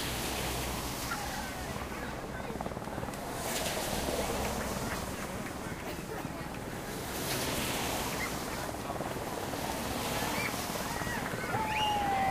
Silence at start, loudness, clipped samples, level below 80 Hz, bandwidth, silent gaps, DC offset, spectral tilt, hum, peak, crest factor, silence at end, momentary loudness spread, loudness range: 0 s; -35 LUFS; under 0.1%; -48 dBFS; 15.5 kHz; none; under 0.1%; -3.5 dB/octave; none; -18 dBFS; 16 dB; 0 s; 7 LU; 3 LU